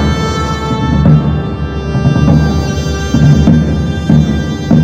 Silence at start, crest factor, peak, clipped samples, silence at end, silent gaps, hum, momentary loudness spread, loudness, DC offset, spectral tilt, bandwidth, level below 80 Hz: 0 s; 10 dB; 0 dBFS; 1%; 0 s; none; none; 7 LU; -11 LUFS; under 0.1%; -7 dB/octave; 8 kHz; -20 dBFS